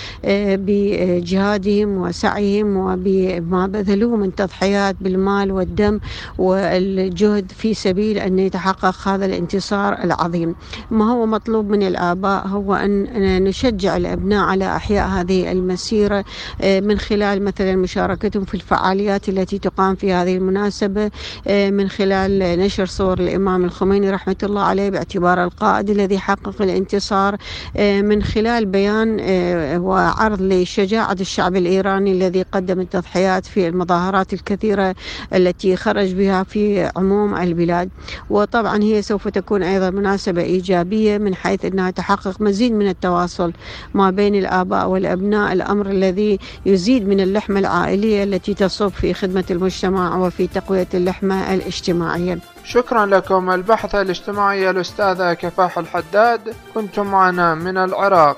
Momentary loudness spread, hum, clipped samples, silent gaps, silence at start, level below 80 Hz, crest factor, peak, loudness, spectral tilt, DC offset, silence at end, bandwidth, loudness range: 4 LU; none; under 0.1%; none; 0 s; -38 dBFS; 16 dB; 0 dBFS; -18 LUFS; -6.5 dB/octave; under 0.1%; 0 s; 9.2 kHz; 2 LU